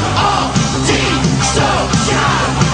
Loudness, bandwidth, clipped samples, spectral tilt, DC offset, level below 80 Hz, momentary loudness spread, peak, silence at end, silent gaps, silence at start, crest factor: -13 LUFS; 10 kHz; under 0.1%; -4 dB/octave; under 0.1%; -28 dBFS; 1 LU; 0 dBFS; 0 s; none; 0 s; 14 dB